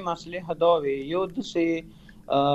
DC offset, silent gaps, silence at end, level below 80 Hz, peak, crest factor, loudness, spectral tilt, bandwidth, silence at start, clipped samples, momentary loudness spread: under 0.1%; none; 0 s; -54 dBFS; -8 dBFS; 16 dB; -26 LUFS; -6 dB/octave; 8.2 kHz; 0 s; under 0.1%; 10 LU